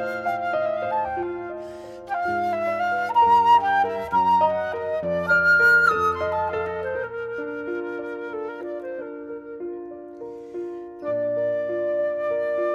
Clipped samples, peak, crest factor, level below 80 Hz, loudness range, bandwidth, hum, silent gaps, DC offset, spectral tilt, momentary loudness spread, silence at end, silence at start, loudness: under 0.1%; -8 dBFS; 16 dB; -58 dBFS; 13 LU; 13.5 kHz; none; none; under 0.1%; -5.5 dB/octave; 18 LU; 0 s; 0 s; -22 LUFS